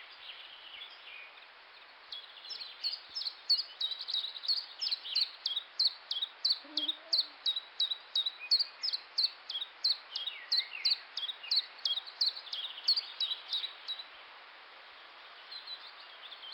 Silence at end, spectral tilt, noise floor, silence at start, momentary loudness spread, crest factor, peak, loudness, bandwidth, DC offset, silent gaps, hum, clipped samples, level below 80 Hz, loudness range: 0 s; 2 dB/octave; -55 dBFS; 0 s; 20 LU; 18 dB; -20 dBFS; -33 LUFS; 17 kHz; under 0.1%; none; none; under 0.1%; under -90 dBFS; 6 LU